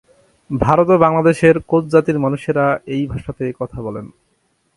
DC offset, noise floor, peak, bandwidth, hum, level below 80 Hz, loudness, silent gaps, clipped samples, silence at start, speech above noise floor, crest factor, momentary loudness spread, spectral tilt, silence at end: under 0.1%; -64 dBFS; 0 dBFS; 11.5 kHz; none; -42 dBFS; -16 LUFS; none; under 0.1%; 0.5 s; 48 dB; 16 dB; 14 LU; -8 dB/octave; 0.7 s